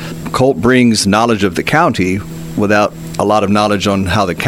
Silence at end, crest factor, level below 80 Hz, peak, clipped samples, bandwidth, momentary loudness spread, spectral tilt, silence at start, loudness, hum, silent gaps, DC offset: 0 s; 12 dB; -38 dBFS; 0 dBFS; under 0.1%; 16.5 kHz; 8 LU; -5 dB/octave; 0 s; -13 LUFS; none; none; under 0.1%